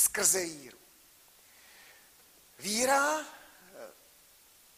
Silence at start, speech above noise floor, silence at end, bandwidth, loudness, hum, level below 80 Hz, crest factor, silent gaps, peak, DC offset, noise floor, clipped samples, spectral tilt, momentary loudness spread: 0 s; 30 dB; 0.85 s; 15.5 kHz; -28 LUFS; none; -72 dBFS; 26 dB; none; -10 dBFS; under 0.1%; -60 dBFS; under 0.1%; -0.5 dB/octave; 26 LU